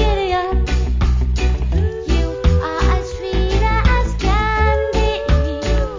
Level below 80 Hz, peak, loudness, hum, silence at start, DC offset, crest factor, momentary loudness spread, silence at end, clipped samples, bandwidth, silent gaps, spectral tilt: -18 dBFS; -2 dBFS; -18 LUFS; none; 0 s; under 0.1%; 14 dB; 4 LU; 0 s; under 0.1%; 7.6 kHz; none; -6.5 dB/octave